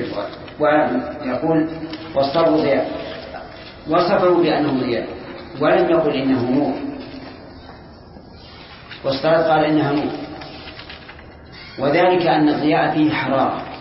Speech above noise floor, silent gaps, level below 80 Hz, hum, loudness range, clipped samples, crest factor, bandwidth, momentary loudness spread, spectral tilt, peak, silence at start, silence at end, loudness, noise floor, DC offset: 23 dB; none; -48 dBFS; none; 3 LU; under 0.1%; 14 dB; 5.8 kHz; 21 LU; -10.5 dB/octave; -4 dBFS; 0 s; 0 s; -18 LUFS; -40 dBFS; under 0.1%